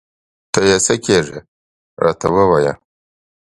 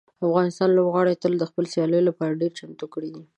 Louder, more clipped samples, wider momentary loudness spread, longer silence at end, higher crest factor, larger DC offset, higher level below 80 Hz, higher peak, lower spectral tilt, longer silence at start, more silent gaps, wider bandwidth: first, -15 LUFS vs -22 LUFS; neither; about the same, 14 LU vs 14 LU; first, 0.85 s vs 0.15 s; about the same, 18 dB vs 16 dB; neither; first, -44 dBFS vs -72 dBFS; first, 0 dBFS vs -6 dBFS; second, -4 dB/octave vs -7 dB/octave; first, 0.55 s vs 0.2 s; first, 1.48-1.97 s vs none; first, 11.5 kHz vs 9.6 kHz